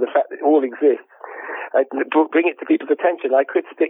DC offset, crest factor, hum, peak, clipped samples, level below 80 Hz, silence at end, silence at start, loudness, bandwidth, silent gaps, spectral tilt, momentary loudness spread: under 0.1%; 14 dB; none; -4 dBFS; under 0.1%; -90 dBFS; 0 s; 0 s; -19 LUFS; 3.8 kHz; none; -8.5 dB/octave; 11 LU